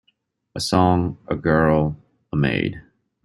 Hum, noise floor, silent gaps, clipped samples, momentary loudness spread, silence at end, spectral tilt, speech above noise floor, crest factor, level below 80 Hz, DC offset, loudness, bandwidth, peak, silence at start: none; -68 dBFS; none; under 0.1%; 15 LU; 0.45 s; -6.5 dB/octave; 48 dB; 18 dB; -44 dBFS; under 0.1%; -21 LUFS; 12.5 kHz; -2 dBFS; 0.55 s